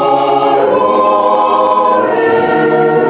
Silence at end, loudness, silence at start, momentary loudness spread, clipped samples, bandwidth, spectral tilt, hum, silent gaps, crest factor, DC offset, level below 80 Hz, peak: 0 s; -10 LUFS; 0 s; 1 LU; under 0.1%; 4 kHz; -9.5 dB/octave; none; none; 10 dB; 0.1%; -56 dBFS; 0 dBFS